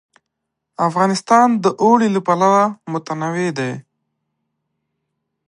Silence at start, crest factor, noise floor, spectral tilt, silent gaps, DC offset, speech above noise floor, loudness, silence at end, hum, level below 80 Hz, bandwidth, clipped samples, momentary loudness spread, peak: 0.8 s; 18 dB; -78 dBFS; -6 dB/octave; none; under 0.1%; 62 dB; -16 LUFS; 1.7 s; none; -70 dBFS; 11 kHz; under 0.1%; 11 LU; 0 dBFS